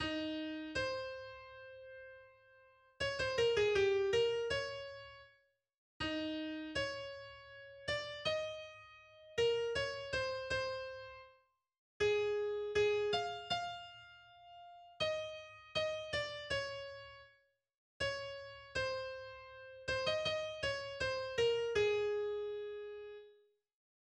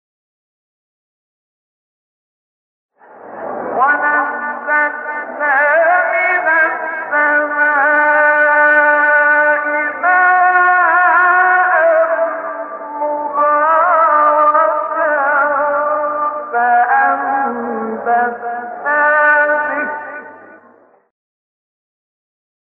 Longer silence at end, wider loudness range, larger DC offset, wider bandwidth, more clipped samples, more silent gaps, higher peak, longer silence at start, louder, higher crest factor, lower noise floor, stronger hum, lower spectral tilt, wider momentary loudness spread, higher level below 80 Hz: second, 0.7 s vs 2.15 s; about the same, 6 LU vs 7 LU; neither; first, 10.5 kHz vs 4.1 kHz; neither; first, 5.78-6.00 s, 11.78-12.00 s, 17.78-18.00 s vs none; second, -22 dBFS vs -2 dBFS; second, 0 s vs 3.15 s; second, -38 LUFS vs -13 LUFS; about the same, 18 dB vs 14 dB; first, -74 dBFS vs -48 dBFS; neither; second, -3.5 dB/octave vs -7 dB/octave; first, 20 LU vs 11 LU; first, -64 dBFS vs -70 dBFS